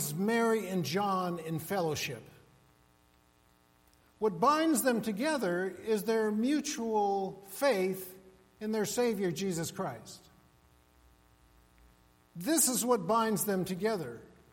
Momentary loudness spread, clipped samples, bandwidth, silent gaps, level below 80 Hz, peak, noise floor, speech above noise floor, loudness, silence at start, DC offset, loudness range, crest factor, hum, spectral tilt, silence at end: 13 LU; under 0.1%; 16.5 kHz; none; -68 dBFS; -14 dBFS; -66 dBFS; 35 dB; -31 LUFS; 0 s; under 0.1%; 7 LU; 18 dB; none; -4 dB/octave; 0.25 s